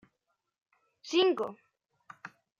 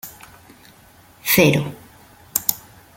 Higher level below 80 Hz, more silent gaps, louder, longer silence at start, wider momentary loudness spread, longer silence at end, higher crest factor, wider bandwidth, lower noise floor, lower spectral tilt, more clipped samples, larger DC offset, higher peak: second, -88 dBFS vs -56 dBFS; neither; second, -30 LUFS vs -18 LUFS; first, 1.05 s vs 0.05 s; about the same, 22 LU vs 20 LU; about the same, 0.3 s vs 0.35 s; about the same, 20 dB vs 24 dB; second, 7.4 kHz vs 17 kHz; first, -82 dBFS vs -49 dBFS; about the same, -3.5 dB/octave vs -4 dB/octave; neither; neither; second, -16 dBFS vs 0 dBFS